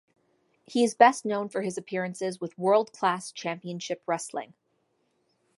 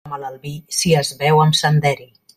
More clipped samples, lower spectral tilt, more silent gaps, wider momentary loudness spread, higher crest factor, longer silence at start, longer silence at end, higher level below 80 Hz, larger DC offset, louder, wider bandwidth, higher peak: neither; about the same, -4.5 dB/octave vs -4.5 dB/octave; neither; about the same, 14 LU vs 16 LU; first, 24 dB vs 16 dB; first, 0.7 s vs 0.05 s; first, 1.15 s vs 0.35 s; second, -80 dBFS vs -52 dBFS; neither; second, -27 LUFS vs -16 LUFS; second, 11.5 kHz vs 14.5 kHz; second, -6 dBFS vs -2 dBFS